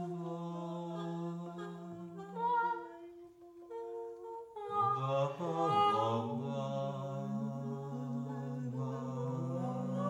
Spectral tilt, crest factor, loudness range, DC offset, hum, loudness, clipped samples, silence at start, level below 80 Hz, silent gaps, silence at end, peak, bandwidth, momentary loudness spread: -7.5 dB/octave; 18 dB; 6 LU; under 0.1%; none; -38 LUFS; under 0.1%; 0 s; -80 dBFS; none; 0 s; -20 dBFS; 11 kHz; 14 LU